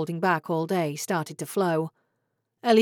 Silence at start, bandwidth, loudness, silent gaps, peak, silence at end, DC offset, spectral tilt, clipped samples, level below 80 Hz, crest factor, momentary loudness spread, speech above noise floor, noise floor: 0 s; 18.5 kHz; -27 LUFS; none; -8 dBFS; 0 s; under 0.1%; -5.5 dB/octave; under 0.1%; under -90 dBFS; 18 dB; 6 LU; 51 dB; -77 dBFS